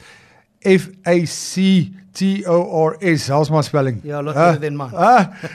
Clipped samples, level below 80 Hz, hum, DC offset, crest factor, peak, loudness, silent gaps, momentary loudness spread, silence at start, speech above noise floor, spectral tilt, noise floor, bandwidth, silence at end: under 0.1%; -60 dBFS; none; under 0.1%; 16 dB; -2 dBFS; -17 LUFS; none; 8 LU; 0.65 s; 34 dB; -6 dB/octave; -50 dBFS; 13 kHz; 0 s